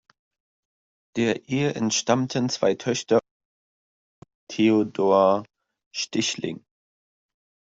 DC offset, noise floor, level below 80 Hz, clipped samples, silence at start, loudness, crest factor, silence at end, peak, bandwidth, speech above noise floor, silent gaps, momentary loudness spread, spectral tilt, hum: under 0.1%; under -90 dBFS; -66 dBFS; under 0.1%; 1.15 s; -23 LUFS; 20 dB; 1.2 s; -6 dBFS; 8 kHz; over 68 dB; 3.31-4.22 s, 4.35-4.47 s, 5.86-5.91 s; 13 LU; -4.5 dB/octave; none